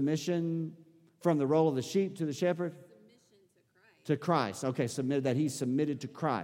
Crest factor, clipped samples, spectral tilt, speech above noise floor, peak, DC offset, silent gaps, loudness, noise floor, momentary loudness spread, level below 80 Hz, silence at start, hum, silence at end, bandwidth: 18 dB; under 0.1%; -6.5 dB/octave; 37 dB; -14 dBFS; under 0.1%; none; -32 LUFS; -68 dBFS; 7 LU; -78 dBFS; 0 s; none; 0 s; 16.5 kHz